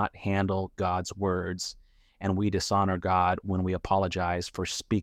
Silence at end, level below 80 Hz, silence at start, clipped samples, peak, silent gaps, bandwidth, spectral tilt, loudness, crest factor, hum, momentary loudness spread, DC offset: 0 s; -50 dBFS; 0 s; under 0.1%; -12 dBFS; none; 14 kHz; -5.5 dB/octave; -29 LUFS; 16 dB; none; 7 LU; under 0.1%